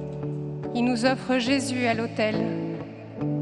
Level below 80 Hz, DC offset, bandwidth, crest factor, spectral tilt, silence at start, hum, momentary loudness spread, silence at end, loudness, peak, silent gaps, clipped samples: -58 dBFS; under 0.1%; 11.5 kHz; 20 dB; -5.5 dB/octave; 0 s; none; 9 LU; 0 s; -26 LUFS; -6 dBFS; none; under 0.1%